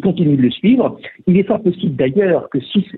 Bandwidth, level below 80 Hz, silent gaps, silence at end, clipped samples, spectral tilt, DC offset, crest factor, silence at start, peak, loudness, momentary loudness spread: 4.1 kHz; -52 dBFS; none; 0 s; under 0.1%; -11 dB/octave; under 0.1%; 12 dB; 0 s; -4 dBFS; -15 LUFS; 5 LU